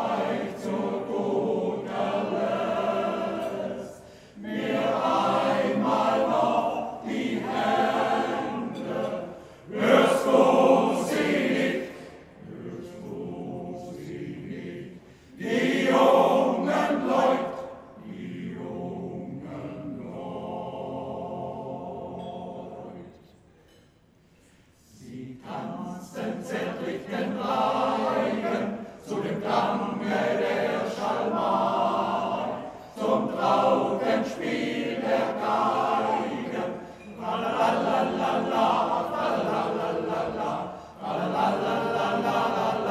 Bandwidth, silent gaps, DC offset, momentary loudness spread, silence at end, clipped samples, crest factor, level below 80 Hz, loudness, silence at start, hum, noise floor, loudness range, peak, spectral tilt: 14.5 kHz; none; under 0.1%; 16 LU; 0 s; under 0.1%; 22 dB; -64 dBFS; -26 LUFS; 0 s; none; -59 dBFS; 13 LU; -6 dBFS; -5.5 dB/octave